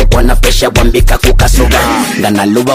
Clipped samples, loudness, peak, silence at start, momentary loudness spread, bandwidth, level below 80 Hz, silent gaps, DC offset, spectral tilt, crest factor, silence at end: 0.2%; -9 LUFS; 0 dBFS; 0 s; 2 LU; 16 kHz; -10 dBFS; none; under 0.1%; -4.5 dB/octave; 6 dB; 0 s